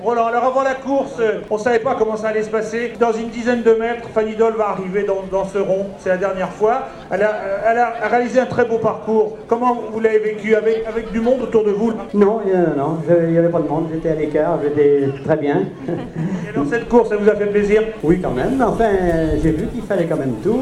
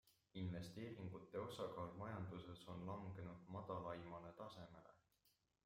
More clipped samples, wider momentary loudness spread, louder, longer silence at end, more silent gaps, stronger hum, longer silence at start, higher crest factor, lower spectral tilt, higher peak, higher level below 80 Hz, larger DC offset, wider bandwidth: neither; about the same, 5 LU vs 7 LU; first, -18 LUFS vs -53 LUFS; second, 0 s vs 0.35 s; neither; neither; about the same, 0 s vs 0.05 s; about the same, 16 dB vs 16 dB; about the same, -7.5 dB/octave vs -7 dB/octave; first, 0 dBFS vs -36 dBFS; first, -38 dBFS vs -78 dBFS; neither; second, 11 kHz vs 16 kHz